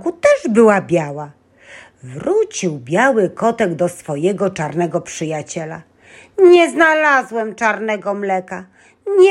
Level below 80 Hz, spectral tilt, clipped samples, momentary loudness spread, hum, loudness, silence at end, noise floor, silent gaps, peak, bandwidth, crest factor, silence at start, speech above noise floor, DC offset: -60 dBFS; -5.5 dB/octave; under 0.1%; 18 LU; none; -16 LUFS; 0 s; -42 dBFS; none; 0 dBFS; 12 kHz; 16 dB; 0 s; 26 dB; under 0.1%